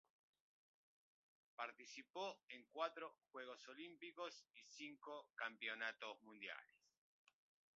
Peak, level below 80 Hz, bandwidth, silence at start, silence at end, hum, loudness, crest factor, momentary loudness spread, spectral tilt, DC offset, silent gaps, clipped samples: -32 dBFS; under -90 dBFS; 7.4 kHz; 1.6 s; 1.1 s; none; -53 LUFS; 24 dB; 10 LU; 1 dB/octave; under 0.1%; 2.10-2.14 s, 2.43-2.48 s; under 0.1%